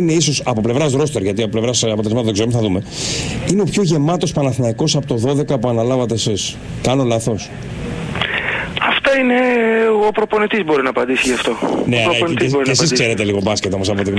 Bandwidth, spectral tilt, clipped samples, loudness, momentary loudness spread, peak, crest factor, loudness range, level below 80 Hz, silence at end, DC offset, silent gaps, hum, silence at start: 11 kHz; -4.5 dB/octave; under 0.1%; -16 LUFS; 6 LU; -2 dBFS; 14 dB; 3 LU; -42 dBFS; 0 s; under 0.1%; none; none; 0 s